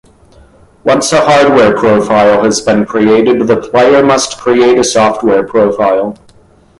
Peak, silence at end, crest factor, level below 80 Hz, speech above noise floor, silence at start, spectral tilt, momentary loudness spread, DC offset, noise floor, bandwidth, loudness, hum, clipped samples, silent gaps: 0 dBFS; 0.65 s; 10 dB; -44 dBFS; 35 dB; 0.85 s; -4.5 dB/octave; 5 LU; under 0.1%; -43 dBFS; 11.5 kHz; -9 LUFS; none; under 0.1%; none